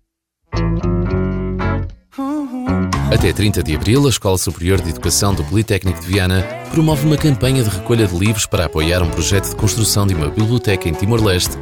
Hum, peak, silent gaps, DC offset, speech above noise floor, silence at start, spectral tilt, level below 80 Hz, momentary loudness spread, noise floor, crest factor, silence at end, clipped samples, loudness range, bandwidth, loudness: none; -2 dBFS; none; under 0.1%; 52 dB; 0.5 s; -5 dB/octave; -28 dBFS; 6 LU; -67 dBFS; 14 dB; 0 s; under 0.1%; 3 LU; 19.5 kHz; -16 LUFS